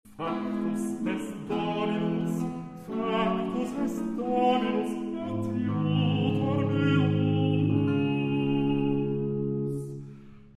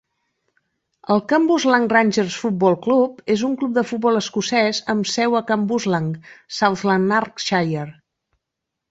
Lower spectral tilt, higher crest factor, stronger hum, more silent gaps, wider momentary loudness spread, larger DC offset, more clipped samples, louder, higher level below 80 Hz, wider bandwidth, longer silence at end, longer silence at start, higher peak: first, -7.5 dB/octave vs -5 dB/octave; about the same, 16 dB vs 18 dB; neither; neither; about the same, 8 LU vs 7 LU; neither; neither; second, -28 LUFS vs -19 LUFS; about the same, -58 dBFS vs -62 dBFS; first, 13.5 kHz vs 8 kHz; second, 0.05 s vs 1 s; second, 0.05 s vs 1.1 s; second, -12 dBFS vs -2 dBFS